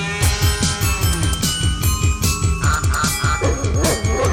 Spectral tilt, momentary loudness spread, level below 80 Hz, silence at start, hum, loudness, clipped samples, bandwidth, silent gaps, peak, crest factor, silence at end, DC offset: -4 dB/octave; 1 LU; -24 dBFS; 0 s; none; -18 LUFS; under 0.1%; 18 kHz; none; -4 dBFS; 14 dB; 0 s; under 0.1%